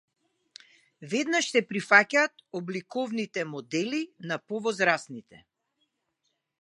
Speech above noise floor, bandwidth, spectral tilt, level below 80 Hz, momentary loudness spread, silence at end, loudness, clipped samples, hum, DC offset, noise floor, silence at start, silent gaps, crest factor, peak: 51 dB; 11.5 kHz; -3.5 dB/octave; -82 dBFS; 14 LU; 1.25 s; -27 LUFS; under 0.1%; none; under 0.1%; -79 dBFS; 1 s; none; 26 dB; -2 dBFS